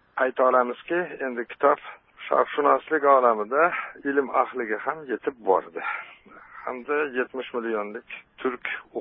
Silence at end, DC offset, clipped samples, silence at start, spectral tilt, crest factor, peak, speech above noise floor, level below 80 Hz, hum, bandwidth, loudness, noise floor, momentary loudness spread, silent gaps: 0 s; under 0.1%; under 0.1%; 0.15 s; -9 dB/octave; 20 dB; -4 dBFS; 22 dB; -70 dBFS; none; 3.9 kHz; -25 LUFS; -47 dBFS; 14 LU; none